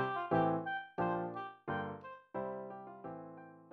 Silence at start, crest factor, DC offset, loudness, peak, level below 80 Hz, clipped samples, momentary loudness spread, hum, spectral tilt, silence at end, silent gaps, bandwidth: 0 s; 18 dB; under 0.1%; -39 LUFS; -20 dBFS; -72 dBFS; under 0.1%; 16 LU; none; -9 dB/octave; 0 s; none; 5.4 kHz